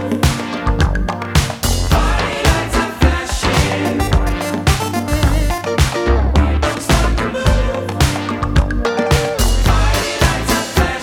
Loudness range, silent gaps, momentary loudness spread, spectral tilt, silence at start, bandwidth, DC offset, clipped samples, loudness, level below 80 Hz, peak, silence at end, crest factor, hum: 1 LU; none; 3 LU; -5 dB/octave; 0 s; 18 kHz; under 0.1%; under 0.1%; -16 LUFS; -18 dBFS; 0 dBFS; 0 s; 14 dB; none